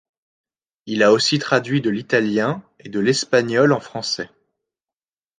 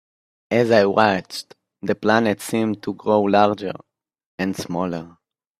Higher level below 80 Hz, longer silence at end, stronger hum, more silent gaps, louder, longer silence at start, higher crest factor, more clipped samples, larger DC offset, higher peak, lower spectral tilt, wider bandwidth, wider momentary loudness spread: about the same, -64 dBFS vs -62 dBFS; first, 1.15 s vs 0.5 s; neither; second, none vs 4.26-4.38 s; about the same, -19 LUFS vs -20 LUFS; first, 0.85 s vs 0.5 s; about the same, 20 dB vs 20 dB; neither; neither; about the same, -2 dBFS vs 0 dBFS; about the same, -4.5 dB/octave vs -5.5 dB/octave; second, 9.8 kHz vs 15 kHz; second, 11 LU vs 15 LU